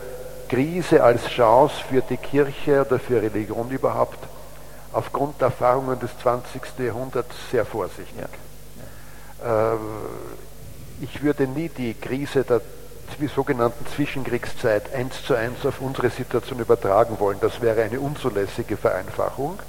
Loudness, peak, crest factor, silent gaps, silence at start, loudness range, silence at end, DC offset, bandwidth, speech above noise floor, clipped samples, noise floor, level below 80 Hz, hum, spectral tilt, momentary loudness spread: -23 LUFS; -2 dBFS; 22 dB; none; 0 s; 8 LU; 0 s; 1%; 17 kHz; 20 dB; under 0.1%; -43 dBFS; -46 dBFS; none; -6.5 dB/octave; 20 LU